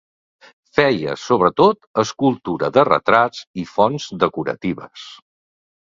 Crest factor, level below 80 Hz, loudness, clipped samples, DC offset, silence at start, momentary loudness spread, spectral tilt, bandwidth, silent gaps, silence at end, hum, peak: 20 dB; -56 dBFS; -18 LUFS; under 0.1%; under 0.1%; 0.75 s; 13 LU; -5.5 dB/octave; 7.6 kHz; 1.87-1.94 s, 3.47-3.54 s; 0.7 s; none; 0 dBFS